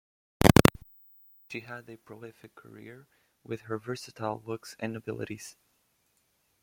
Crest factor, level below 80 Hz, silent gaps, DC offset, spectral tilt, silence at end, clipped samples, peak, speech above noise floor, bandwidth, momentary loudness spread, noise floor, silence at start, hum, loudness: 30 dB; -48 dBFS; none; under 0.1%; -5.5 dB/octave; 1.1 s; under 0.1%; -2 dBFS; 34 dB; 16.5 kHz; 27 LU; -73 dBFS; 0.4 s; none; -28 LUFS